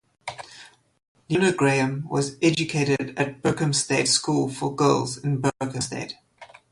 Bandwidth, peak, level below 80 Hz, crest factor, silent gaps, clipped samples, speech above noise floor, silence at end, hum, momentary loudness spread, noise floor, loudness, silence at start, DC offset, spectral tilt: 11.5 kHz; -6 dBFS; -60 dBFS; 18 dB; 1.08-1.15 s; under 0.1%; 26 dB; 0.25 s; none; 17 LU; -49 dBFS; -23 LUFS; 0.25 s; under 0.1%; -4.5 dB/octave